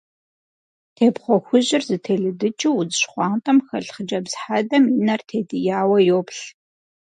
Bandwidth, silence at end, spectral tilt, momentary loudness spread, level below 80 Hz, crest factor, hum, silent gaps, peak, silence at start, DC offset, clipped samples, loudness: 11 kHz; 0.6 s; -5 dB/octave; 10 LU; -70 dBFS; 18 dB; none; none; -2 dBFS; 1 s; under 0.1%; under 0.1%; -20 LUFS